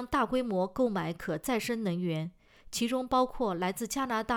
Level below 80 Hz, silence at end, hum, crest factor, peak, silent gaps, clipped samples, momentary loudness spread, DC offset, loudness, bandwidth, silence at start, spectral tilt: -54 dBFS; 0 s; none; 16 dB; -16 dBFS; none; under 0.1%; 6 LU; under 0.1%; -31 LUFS; over 20 kHz; 0 s; -5 dB/octave